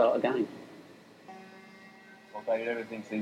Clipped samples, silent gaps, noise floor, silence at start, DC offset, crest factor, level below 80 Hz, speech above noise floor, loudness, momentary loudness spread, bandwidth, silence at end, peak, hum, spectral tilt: under 0.1%; none; -53 dBFS; 0 s; under 0.1%; 20 dB; -84 dBFS; 23 dB; -32 LUFS; 22 LU; 12 kHz; 0 s; -14 dBFS; none; -6 dB/octave